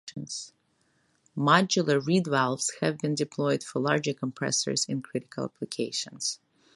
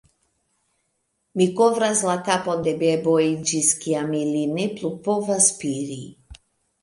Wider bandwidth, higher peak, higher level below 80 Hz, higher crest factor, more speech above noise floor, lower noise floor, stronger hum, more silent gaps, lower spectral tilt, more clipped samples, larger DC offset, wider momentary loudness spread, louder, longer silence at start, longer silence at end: about the same, 11.5 kHz vs 11.5 kHz; about the same, -6 dBFS vs -4 dBFS; second, -72 dBFS vs -60 dBFS; about the same, 24 dB vs 20 dB; second, 42 dB vs 52 dB; about the same, -70 dBFS vs -73 dBFS; neither; neither; about the same, -4 dB/octave vs -4 dB/octave; neither; neither; first, 14 LU vs 10 LU; second, -28 LUFS vs -21 LUFS; second, 0.05 s vs 1.35 s; about the same, 0.4 s vs 0.45 s